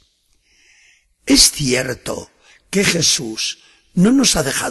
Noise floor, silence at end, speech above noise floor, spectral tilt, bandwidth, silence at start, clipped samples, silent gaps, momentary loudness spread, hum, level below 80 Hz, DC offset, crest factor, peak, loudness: -60 dBFS; 0 s; 44 dB; -3 dB/octave; 16 kHz; 1.25 s; under 0.1%; none; 17 LU; none; -40 dBFS; under 0.1%; 18 dB; 0 dBFS; -15 LUFS